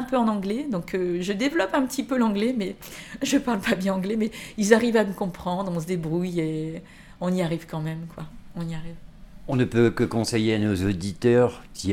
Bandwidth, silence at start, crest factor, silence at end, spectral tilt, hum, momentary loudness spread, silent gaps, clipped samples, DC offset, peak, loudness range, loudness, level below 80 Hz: 18 kHz; 0 s; 22 dB; 0 s; -6 dB/octave; none; 14 LU; none; under 0.1%; under 0.1%; -2 dBFS; 5 LU; -25 LUFS; -48 dBFS